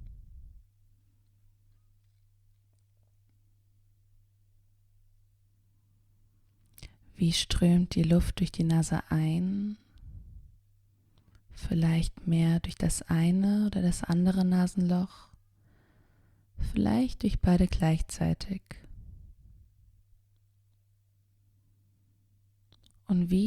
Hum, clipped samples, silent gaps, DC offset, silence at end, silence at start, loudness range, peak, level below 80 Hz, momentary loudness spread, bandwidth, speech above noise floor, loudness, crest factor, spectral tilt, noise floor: none; under 0.1%; none; under 0.1%; 0 s; 0 s; 8 LU; -12 dBFS; -44 dBFS; 15 LU; 13.5 kHz; 41 dB; -28 LUFS; 18 dB; -6.5 dB/octave; -68 dBFS